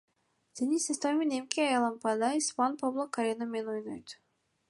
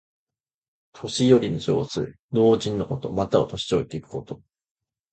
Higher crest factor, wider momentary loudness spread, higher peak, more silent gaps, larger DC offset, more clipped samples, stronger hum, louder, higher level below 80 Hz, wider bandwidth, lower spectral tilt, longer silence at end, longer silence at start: about the same, 24 dB vs 20 dB; second, 11 LU vs 16 LU; second, -8 dBFS vs -4 dBFS; second, none vs 2.19-2.29 s; neither; neither; neither; second, -31 LUFS vs -23 LUFS; second, -80 dBFS vs -52 dBFS; first, 11.5 kHz vs 9 kHz; second, -2.5 dB/octave vs -6 dB/octave; second, 0.55 s vs 0.75 s; second, 0.55 s vs 0.95 s